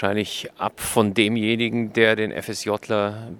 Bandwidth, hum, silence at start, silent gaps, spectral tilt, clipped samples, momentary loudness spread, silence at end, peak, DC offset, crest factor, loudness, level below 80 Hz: 18 kHz; none; 0 s; none; -4.5 dB/octave; under 0.1%; 9 LU; 0 s; -2 dBFS; under 0.1%; 20 dB; -22 LUFS; -56 dBFS